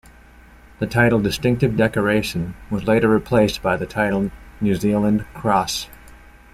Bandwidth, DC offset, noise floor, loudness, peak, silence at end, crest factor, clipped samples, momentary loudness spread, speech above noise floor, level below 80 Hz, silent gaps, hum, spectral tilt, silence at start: 15 kHz; under 0.1%; -46 dBFS; -20 LUFS; -2 dBFS; 0.4 s; 18 dB; under 0.1%; 9 LU; 27 dB; -42 dBFS; none; none; -6 dB/octave; 0.8 s